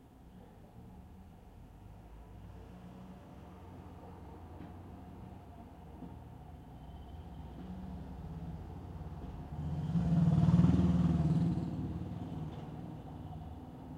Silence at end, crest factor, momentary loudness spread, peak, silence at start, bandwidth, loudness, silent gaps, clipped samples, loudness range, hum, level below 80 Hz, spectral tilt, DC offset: 0 s; 22 dB; 25 LU; -16 dBFS; 0 s; 7.4 kHz; -35 LUFS; none; under 0.1%; 21 LU; none; -52 dBFS; -9.5 dB/octave; under 0.1%